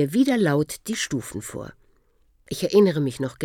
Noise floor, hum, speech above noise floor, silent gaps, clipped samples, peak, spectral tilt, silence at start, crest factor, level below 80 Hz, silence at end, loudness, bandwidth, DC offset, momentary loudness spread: -61 dBFS; none; 39 dB; none; under 0.1%; -6 dBFS; -5.5 dB/octave; 0 s; 18 dB; -56 dBFS; 0 s; -23 LUFS; 18 kHz; under 0.1%; 17 LU